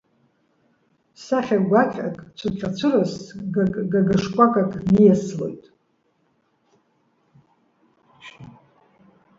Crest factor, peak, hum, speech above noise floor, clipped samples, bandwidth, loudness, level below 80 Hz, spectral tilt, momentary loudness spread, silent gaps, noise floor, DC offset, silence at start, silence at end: 22 dB; -2 dBFS; none; 47 dB; under 0.1%; 7.6 kHz; -21 LUFS; -54 dBFS; -7.5 dB/octave; 16 LU; none; -67 dBFS; under 0.1%; 1.2 s; 0.9 s